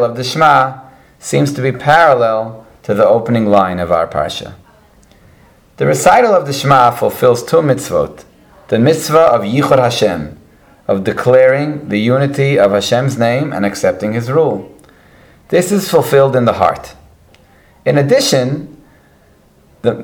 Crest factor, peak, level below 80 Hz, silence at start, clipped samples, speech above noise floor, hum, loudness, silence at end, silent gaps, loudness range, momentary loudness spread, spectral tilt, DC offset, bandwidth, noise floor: 14 dB; 0 dBFS; -46 dBFS; 0 s; 0.2%; 36 dB; none; -12 LUFS; 0 s; none; 3 LU; 10 LU; -5.5 dB/octave; under 0.1%; 20 kHz; -48 dBFS